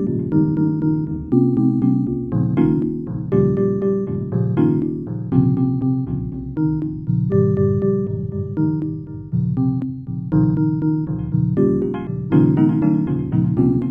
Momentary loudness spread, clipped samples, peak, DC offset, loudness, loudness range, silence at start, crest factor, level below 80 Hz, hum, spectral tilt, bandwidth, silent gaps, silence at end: 8 LU; under 0.1%; -2 dBFS; under 0.1%; -19 LUFS; 2 LU; 0 s; 16 dB; -42 dBFS; none; -12.5 dB/octave; 3.5 kHz; none; 0 s